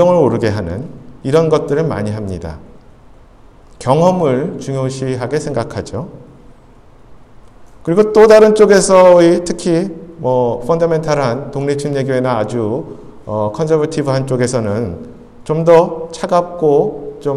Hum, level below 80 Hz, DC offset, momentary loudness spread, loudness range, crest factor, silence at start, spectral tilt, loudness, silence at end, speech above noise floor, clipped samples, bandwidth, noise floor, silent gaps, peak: none; -42 dBFS; under 0.1%; 17 LU; 9 LU; 14 dB; 0 s; -6 dB/octave; -13 LUFS; 0 s; 29 dB; under 0.1%; 12 kHz; -41 dBFS; none; 0 dBFS